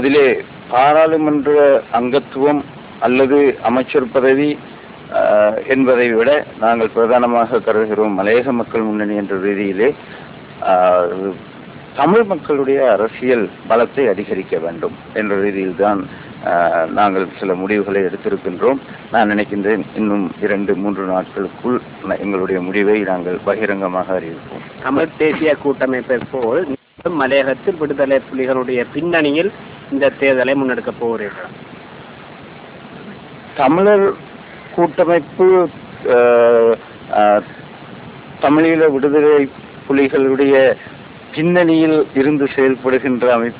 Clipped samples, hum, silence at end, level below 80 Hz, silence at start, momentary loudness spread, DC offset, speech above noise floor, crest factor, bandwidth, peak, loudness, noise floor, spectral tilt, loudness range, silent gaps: under 0.1%; none; 0 s; -52 dBFS; 0 s; 19 LU; under 0.1%; 21 dB; 14 dB; 4 kHz; -2 dBFS; -15 LUFS; -35 dBFS; -10 dB/octave; 4 LU; none